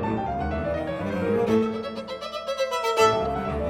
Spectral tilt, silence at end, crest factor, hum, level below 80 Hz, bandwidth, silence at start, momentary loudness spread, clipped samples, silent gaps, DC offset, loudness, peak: -5.5 dB/octave; 0 s; 18 dB; none; -42 dBFS; 17 kHz; 0 s; 11 LU; under 0.1%; none; under 0.1%; -25 LUFS; -8 dBFS